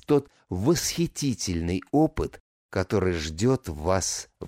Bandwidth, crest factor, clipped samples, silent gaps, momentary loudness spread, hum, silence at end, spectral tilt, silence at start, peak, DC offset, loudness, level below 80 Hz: 16 kHz; 16 dB; under 0.1%; 2.40-2.69 s; 8 LU; none; 0 s; -5 dB/octave; 0.1 s; -10 dBFS; under 0.1%; -26 LUFS; -44 dBFS